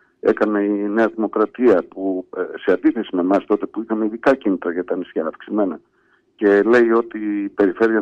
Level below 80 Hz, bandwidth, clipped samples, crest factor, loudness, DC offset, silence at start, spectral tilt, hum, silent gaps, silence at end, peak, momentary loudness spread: -60 dBFS; 7.6 kHz; under 0.1%; 14 dB; -19 LUFS; under 0.1%; 0.25 s; -7.5 dB/octave; none; none; 0 s; -4 dBFS; 9 LU